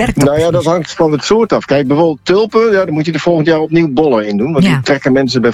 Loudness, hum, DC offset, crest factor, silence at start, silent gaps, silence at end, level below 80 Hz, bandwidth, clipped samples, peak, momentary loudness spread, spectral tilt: -11 LUFS; none; under 0.1%; 10 dB; 0 s; none; 0 s; -38 dBFS; 14.5 kHz; under 0.1%; 0 dBFS; 3 LU; -6 dB/octave